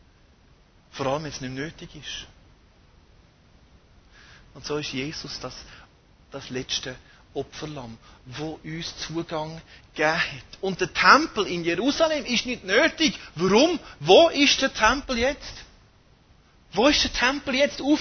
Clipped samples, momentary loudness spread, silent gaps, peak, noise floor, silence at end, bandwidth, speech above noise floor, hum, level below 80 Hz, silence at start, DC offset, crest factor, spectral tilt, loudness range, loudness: under 0.1%; 20 LU; none; -2 dBFS; -56 dBFS; 0 s; 6.6 kHz; 32 dB; none; -48 dBFS; 0.95 s; under 0.1%; 24 dB; -3.5 dB/octave; 15 LU; -23 LUFS